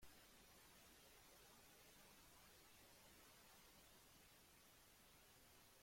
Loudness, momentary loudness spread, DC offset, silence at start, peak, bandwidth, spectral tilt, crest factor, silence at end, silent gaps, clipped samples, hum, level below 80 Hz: -67 LUFS; 2 LU; under 0.1%; 0 s; -52 dBFS; 16.5 kHz; -2 dB/octave; 16 dB; 0 s; none; under 0.1%; none; -80 dBFS